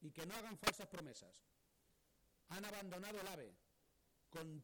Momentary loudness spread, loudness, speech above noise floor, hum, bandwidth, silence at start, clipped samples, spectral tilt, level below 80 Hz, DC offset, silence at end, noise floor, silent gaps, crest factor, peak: 16 LU; -48 LUFS; 29 dB; none; over 20 kHz; 0 s; under 0.1%; -3 dB/octave; -74 dBFS; under 0.1%; 0 s; -79 dBFS; none; 30 dB; -22 dBFS